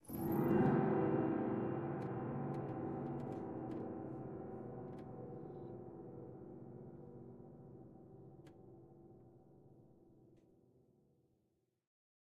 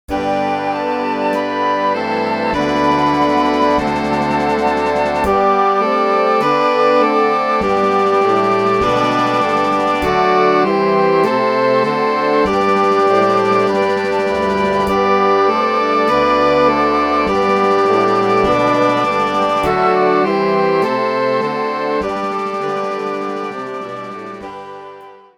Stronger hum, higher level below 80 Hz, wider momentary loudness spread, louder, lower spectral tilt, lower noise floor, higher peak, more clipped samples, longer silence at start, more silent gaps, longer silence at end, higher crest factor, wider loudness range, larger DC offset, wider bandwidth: neither; second, -72 dBFS vs -42 dBFS; first, 24 LU vs 7 LU; second, -41 LUFS vs -15 LUFS; first, -9.5 dB/octave vs -5.5 dB/octave; first, -82 dBFS vs -37 dBFS; second, -22 dBFS vs 0 dBFS; neither; about the same, 0.05 s vs 0.1 s; neither; first, 1.95 s vs 0.2 s; first, 20 dB vs 14 dB; first, 24 LU vs 3 LU; second, under 0.1% vs 0.1%; about the same, 13.5 kHz vs 13.5 kHz